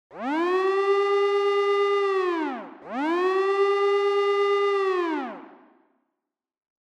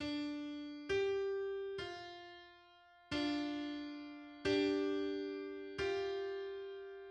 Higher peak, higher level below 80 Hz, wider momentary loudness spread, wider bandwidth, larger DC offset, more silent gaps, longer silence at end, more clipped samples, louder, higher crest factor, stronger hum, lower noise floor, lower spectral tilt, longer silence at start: first, -12 dBFS vs -24 dBFS; second, -88 dBFS vs -68 dBFS; second, 9 LU vs 14 LU; about the same, 8.6 kHz vs 9.2 kHz; neither; neither; first, 1.5 s vs 0 s; neither; first, -23 LUFS vs -40 LUFS; second, 12 dB vs 18 dB; neither; first, -84 dBFS vs -64 dBFS; second, -3.5 dB/octave vs -5 dB/octave; about the same, 0.1 s vs 0 s